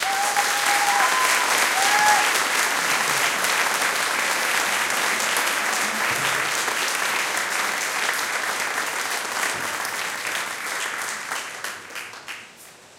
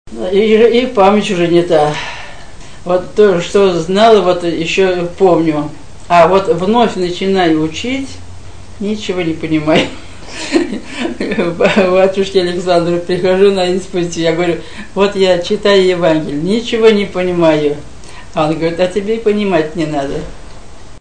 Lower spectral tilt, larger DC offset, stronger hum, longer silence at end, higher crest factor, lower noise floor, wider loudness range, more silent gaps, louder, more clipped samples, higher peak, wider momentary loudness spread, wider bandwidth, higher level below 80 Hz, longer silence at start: second, 0.5 dB/octave vs -5.5 dB/octave; second, under 0.1% vs 4%; neither; about the same, 0.1 s vs 0 s; first, 20 dB vs 12 dB; first, -46 dBFS vs -33 dBFS; about the same, 7 LU vs 5 LU; neither; second, -21 LUFS vs -12 LUFS; second, under 0.1% vs 0.2%; second, -4 dBFS vs 0 dBFS; about the same, 10 LU vs 11 LU; first, 17 kHz vs 9.6 kHz; second, -72 dBFS vs -38 dBFS; about the same, 0 s vs 0.05 s